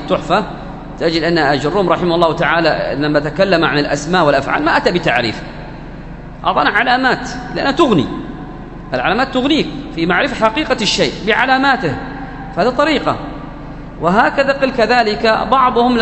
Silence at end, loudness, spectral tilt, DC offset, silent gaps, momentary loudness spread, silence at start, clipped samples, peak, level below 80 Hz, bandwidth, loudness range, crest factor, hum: 0 s; -14 LUFS; -5 dB/octave; under 0.1%; none; 16 LU; 0 s; under 0.1%; 0 dBFS; -34 dBFS; 9 kHz; 2 LU; 14 dB; 50 Hz at -35 dBFS